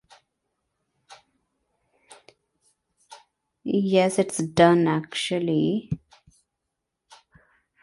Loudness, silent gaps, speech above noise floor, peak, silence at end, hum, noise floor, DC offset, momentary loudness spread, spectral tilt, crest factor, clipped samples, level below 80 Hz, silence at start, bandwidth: -23 LUFS; none; 61 dB; -4 dBFS; 1.85 s; none; -82 dBFS; under 0.1%; 14 LU; -5.5 dB/octave; 22 dB; under 0.1%; -60 dBFS; 1.1 s; 11.5 kHz